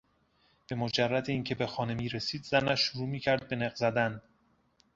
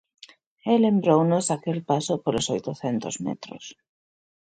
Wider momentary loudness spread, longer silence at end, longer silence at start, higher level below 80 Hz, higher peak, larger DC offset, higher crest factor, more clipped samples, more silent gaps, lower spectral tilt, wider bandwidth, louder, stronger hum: second, 6 LU vs 16 LU; about the same, 0.75 s vs 0.7 s; about the same, 0.7 s vs 0.65 s; about the same, -62 dBFS vs -62 dBFS; second, -10 dBFS vs -6 dBFS; neither; about the same, 22 dB vs 18 dB; neither; neither; about the same, -5.5 dB/octave vs -5.5 dB/octave; second, 7.8 kHz vs 9.4 kHz; second, -31 LUFS vs -24 LUFS; neither